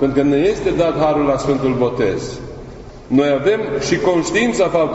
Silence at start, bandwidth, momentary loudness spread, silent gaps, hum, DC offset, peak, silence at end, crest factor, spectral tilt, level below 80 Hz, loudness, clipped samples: 0 s; 8.2 kHz; 15 LU; none; none; under 0.1%; -2 dBFS; 0 s; 14 dB; -5.5 dB/octave; -40 dBFS; -16 LUFS; under 0.1%